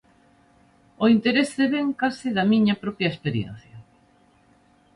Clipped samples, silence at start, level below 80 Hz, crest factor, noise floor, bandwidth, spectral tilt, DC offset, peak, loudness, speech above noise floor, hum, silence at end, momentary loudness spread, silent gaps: under 0.1%; 1 s; -60 dBFS; 18 dB; -59 dBFS; 11.5 kHz; -6 dB/octave; under 0.1%; -6 dBFS; -22 LUFS; 37 dB; none; 1.15 s; 9 LU; none